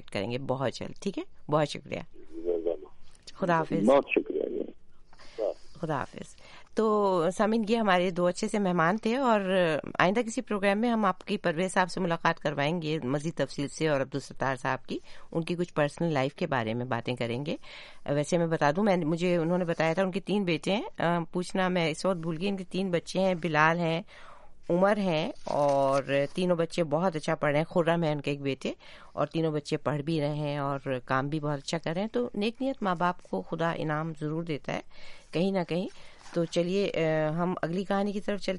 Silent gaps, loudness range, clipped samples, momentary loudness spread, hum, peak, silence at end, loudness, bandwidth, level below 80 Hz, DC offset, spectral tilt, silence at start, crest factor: none; 5 LU; under 0.1%; 10 LU; none; -6 dBFS; 0 s; -29 LUFS; 11.5 kHz; -56 dBFS; under 0.1%; -6 dB/octave; 0 s; 22 dB